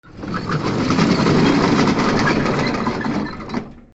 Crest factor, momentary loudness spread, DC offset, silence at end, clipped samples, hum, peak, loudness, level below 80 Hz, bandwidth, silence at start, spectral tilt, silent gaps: 16 dB; 12 LU; under 0.1%; 0.15 s; under 0.1%; none; -2 dBFS; -18 LUFS; -40 dBFS; 8.2 kHz; 0.05 s; -6 dB/octave; none